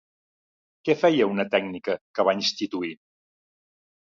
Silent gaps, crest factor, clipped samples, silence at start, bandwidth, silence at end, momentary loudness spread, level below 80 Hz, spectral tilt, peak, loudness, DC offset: 2.01-2.14 s; 20 dB; under 0.1%; 0.85 s; 7.6 kHz; 1.2 s; 11 LU; -70 dBFS; -4.5 dB/octave; -6 dBFS; -24 LUFS; under 0.1%